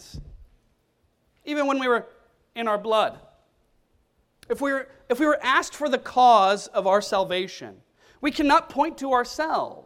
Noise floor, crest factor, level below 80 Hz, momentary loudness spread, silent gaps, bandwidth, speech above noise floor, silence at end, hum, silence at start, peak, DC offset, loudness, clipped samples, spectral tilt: -68 dBFS; 20 dB; -56 dBFS; 14 LU; none; 16 kHz; 45 dB; 0.05 s; none; 0.15 s; -6 dBFS; under 0.1%; -23 LUFS; under 0.1%; -3.5 dB/octave